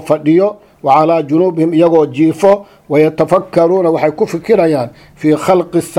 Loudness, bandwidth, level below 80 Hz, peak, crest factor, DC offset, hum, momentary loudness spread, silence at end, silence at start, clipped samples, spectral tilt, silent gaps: -12 LUFS; 14 kHz; -52 dBFS; 0 dBFS; 12 dB; under 0.1%; none; 7 LU; 0 s; 0 s; 0.1%; -7 dB/octave; none